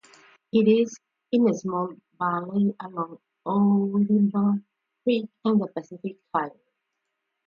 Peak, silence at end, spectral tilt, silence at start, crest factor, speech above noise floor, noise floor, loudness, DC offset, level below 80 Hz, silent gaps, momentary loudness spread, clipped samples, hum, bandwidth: -8 dBFS; 1 s; -7.5 dB/octave; 0.55 s; 16 dB; 57 dB; -80 dBFS; -25 LUFS; under 0.1%; -74 dBFS; none; 13 LU; under 0.1%; none; 7 kHz